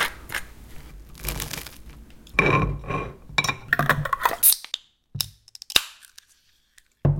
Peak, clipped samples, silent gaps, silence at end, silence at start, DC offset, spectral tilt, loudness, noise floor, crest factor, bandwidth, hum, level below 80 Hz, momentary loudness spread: 0 dBFS; under 0.1%; none; 0 s; 0 s; under 0.1%; -3 dB/octave; -23 LUFS; -62 dBFS; 26 dB; 17 kHz; none; -40 dBFS; 17 LU